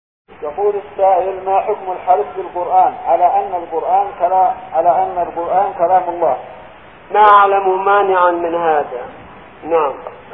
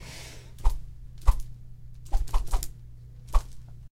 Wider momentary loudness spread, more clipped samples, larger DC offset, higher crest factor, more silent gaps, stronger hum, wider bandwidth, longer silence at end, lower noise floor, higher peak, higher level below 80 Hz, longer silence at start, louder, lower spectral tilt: second, 11 LU vs 18 LU; neither; first, 0.3% vs under 0.1%; about the same, 16 dB vs 20 dB; neither; neither; second, 3.8 kHz vs 15.5 kHz; about the same, 0 s vs 0.1 s; second, -38 dBFS vs -44 dBFS; first, 0 dBFS vs -8 dBFS; second, -54 dBFS vs -28 dBFS; first, 0.4 s vs 0 s; first, -15 LUFS vs -34 LUFS; first, -8.5 dB/octave vs -4.5 dB/octave